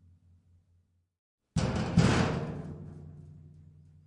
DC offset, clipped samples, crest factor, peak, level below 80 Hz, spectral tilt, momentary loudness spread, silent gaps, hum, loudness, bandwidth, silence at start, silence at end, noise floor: under 0.1%; under 0.1%; 22 dB; -10 dBFS; -48 dBFS; -6 dB/octave; 24 LU; none; none; -30 LUFS; 11 kHz; 1.55 s; 0.6 s; -70 dBFS